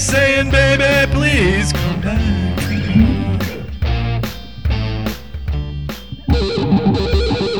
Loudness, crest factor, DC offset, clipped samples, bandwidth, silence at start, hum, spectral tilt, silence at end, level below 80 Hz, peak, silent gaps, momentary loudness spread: -16 LUFS; 14 dB; 1%; under 0.1%; over 20 kHz; 0 s; none; -5.5 dB/octave; 0 s; -22 dBFS; -2 dBFS; none; 12 LU